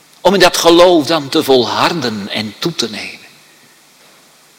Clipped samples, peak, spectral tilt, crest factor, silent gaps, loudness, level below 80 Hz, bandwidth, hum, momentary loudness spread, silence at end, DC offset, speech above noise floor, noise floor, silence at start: 0.4%; 0 dBFS; -3.5 dB/octave; 14 dB; none; -12 LUFS; -46 dBFS; 17 kHz; none; 12 LU; 1.4 s; under 0.1%; 34 dB; -46 dBFS; 0.25 s